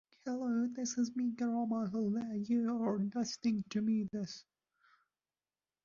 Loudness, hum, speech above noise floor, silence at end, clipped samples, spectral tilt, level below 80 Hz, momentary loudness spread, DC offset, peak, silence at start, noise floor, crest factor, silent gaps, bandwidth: -36 LUFS; none; over 55 dB; 1.45 s; under 0.1%; -6.5 dB/octave; -78 dBFS; 6 LU; under 0.1%; -22 dBFS; 0.25 s; under -90 dBFS; 14 dB; none; 7.2 kHz